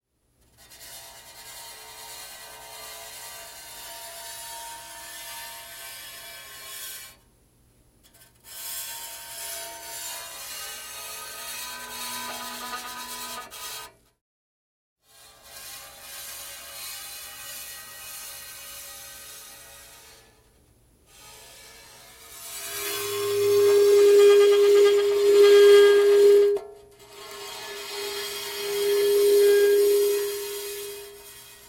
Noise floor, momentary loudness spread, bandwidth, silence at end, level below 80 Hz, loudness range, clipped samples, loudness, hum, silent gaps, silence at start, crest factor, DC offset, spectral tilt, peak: -66 dBFS; 24 LU; 17 kHz; 0.4 s; -64 dBFS; 23 LU; under 0.1%; -22 LUFS; 60 Hz at -70 dBFS; 14.21-14.96 s; 0.8 s; 18 dB; under 0.1%; -2 dB/octave; -6 dBFS